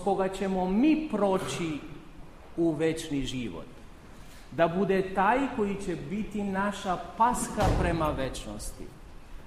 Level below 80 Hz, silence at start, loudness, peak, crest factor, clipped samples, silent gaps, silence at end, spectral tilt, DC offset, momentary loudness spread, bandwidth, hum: -42 dBFS; 0 s; -29 LUFS; -12 dBFS; 18 dB; under 0.1%; none; 0 s; -5.5 dB/octave; under 0.1%; 15 LU; 15.5 kHz; none